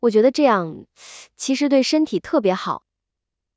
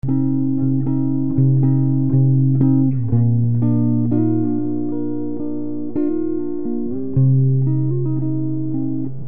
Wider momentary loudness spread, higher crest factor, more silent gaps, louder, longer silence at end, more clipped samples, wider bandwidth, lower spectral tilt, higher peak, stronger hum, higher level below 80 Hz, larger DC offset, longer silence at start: first, 19 LU vs 9 LU; about the same, 16 dB vs 12 dB; neither; about the same, -19 LUFS vs -19 LUFS; first, 0.8 s vs 0 s; neither; first, 8 kHz vs 1.9 kHz; second, -4.5 dB/octave vs -15.5 dB/octave; about the same, -4 dBFS vs -4 dBFS; second, none vs 60 Hz at -40 dBFS; second, -64 dBFS vs -48 dBFS; second, under 0.1% vs 6%; about the same, 0.05 s vs 0 s